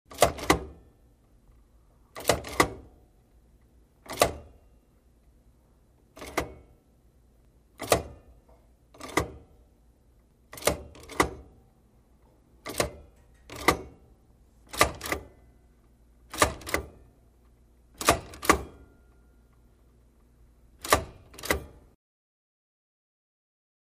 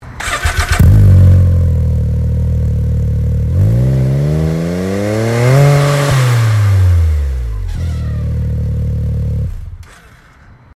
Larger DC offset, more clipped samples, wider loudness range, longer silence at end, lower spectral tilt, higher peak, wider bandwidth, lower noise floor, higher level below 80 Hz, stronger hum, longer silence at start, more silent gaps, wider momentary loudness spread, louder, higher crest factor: neither; neither; about the same, 6 LU vs 6 LU; first, 2.2 s vs 0.9 s; second, -3 dB/octave vs -7 dB/octave; second, -4 dBFS vs 0 dBFS; first, 15.5 kHz vs 14 kHz; first, -61 dBFS vs -41 dBFS; second, -48 dBFS vs -20 dBFS; first, 60 Hz at -65 dBFS vs none; about the same, 0.1 s vs 0 s; neither; first, 20 LU vs 11 LU; second, -29 LUFS vs -13 LUFS; first, 30 dB vs 12 dB